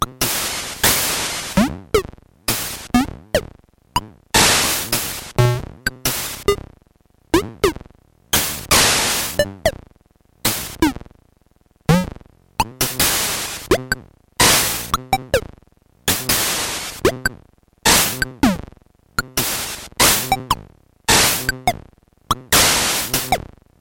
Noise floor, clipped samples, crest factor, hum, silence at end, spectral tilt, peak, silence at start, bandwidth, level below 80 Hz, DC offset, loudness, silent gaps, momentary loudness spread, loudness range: -57 dBFS; under 0.1%; 20 dB; none; 0.4 s; -2.5 dB/octave; 0 dBFS; 0 s; 17 kHz; -36 dBFS; under 0.1%; -18 LUFS; none; 12 LU; 4 LU